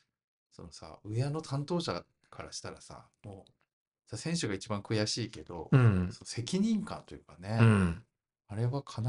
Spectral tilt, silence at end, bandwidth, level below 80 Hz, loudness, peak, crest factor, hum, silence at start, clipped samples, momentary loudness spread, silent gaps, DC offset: -6 dB/octave; 0 s; 11 kHz; -58 dBFS; -32 LUFS; -10 dBFS; 22 dB; none; 0.6 s; under 0.1%; 25 LU; 3.73-3.92 s; under 0.1%